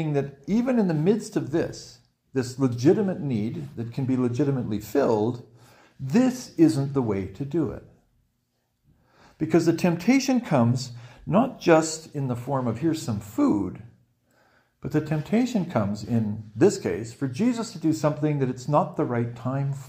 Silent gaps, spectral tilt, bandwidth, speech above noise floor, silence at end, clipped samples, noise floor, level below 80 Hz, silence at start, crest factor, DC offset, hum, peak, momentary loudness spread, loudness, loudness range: none; -7 dB/octave; 16 kHz; 49 dB; 0 s; under 0.1%; -73 dBFS; -58 dBFS; 0 s; 20 dB; under 0.1%; none; -4 dBFS; 10 LU; -25 LUFS; 4 LU